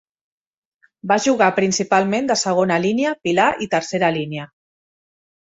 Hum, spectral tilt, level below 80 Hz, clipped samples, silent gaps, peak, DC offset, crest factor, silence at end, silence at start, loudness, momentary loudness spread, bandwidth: none; -4 dB/octave; -60 dBFS; under 0.1%; none; -2 dBFS; under 0.1%; 18 dB; 1.15 s; 1.05 s; -18 LUFS; 7 LU; 8.2 kHz